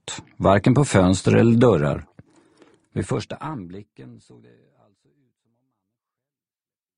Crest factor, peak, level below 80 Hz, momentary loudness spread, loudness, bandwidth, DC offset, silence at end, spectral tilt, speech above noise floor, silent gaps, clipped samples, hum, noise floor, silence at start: 22 dB; -2 dBFS; -48 dBFS; 18 LU; -19 LUFS; 10.5 kHz; under 0.1%; 2.85 s; -6.5 dB/octave; over 70 dB; none; under 0.1%; none; under -90 dBFS; 0.05 s